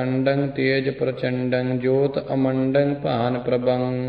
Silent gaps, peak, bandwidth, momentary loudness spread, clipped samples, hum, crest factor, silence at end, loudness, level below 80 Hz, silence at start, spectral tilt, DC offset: none; -6 dBFS; 5 kHz; 3 LU; under 0.1%; none; 16 dB; 0 s; -22 LUFS; -54 dBFS; 0 s; -11 dB/octave; under 0.1%